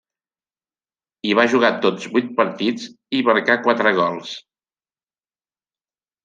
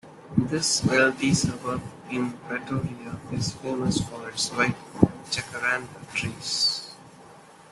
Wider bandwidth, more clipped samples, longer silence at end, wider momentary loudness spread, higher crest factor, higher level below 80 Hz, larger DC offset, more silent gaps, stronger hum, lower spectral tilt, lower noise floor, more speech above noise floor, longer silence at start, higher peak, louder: second, 9 kHz vs 12.5 kHz; neither; first, 1.85 s vs 0.1 s; about the same, 13 LU vs 12 LU; about the same, 20 dB vs 24 dB; second, -70 dBFS vs -52 dBFS; neither; neither; neither; about the same, -5 dB/octave vs -4 dB/octave; first, under -90 dBFS vs -49 dBFS; first, over 71 dB vs 23 dB; first, 1.25 s vs 0.05 s; about the same, -2 dBFS vs -2 dBFS; first, -18 LUFS vs -26 LUFS